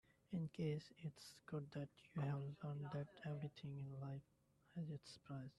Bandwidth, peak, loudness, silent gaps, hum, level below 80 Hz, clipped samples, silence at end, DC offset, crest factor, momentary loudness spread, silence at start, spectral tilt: 12 kHz; -34 dBFS; -50 LUFS; none; none; -80 dBFS; under 0.1%; 0.05 s; under 0.1%; 16 dB; 9 LU; 0.3 s; -7.5 dB/octave